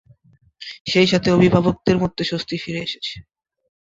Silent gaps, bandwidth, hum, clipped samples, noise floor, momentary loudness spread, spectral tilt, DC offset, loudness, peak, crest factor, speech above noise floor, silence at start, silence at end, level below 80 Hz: 0.80-0.85 s; 7.8 kHz; none; under 0.1%; -55 dBFS; 17 LU; -6 dB/octave; under 0.1%; -19 LUFS; -2 dBFS; 20 dB; 37 dB; 0.6 s; 0.65 s; -48 dBFS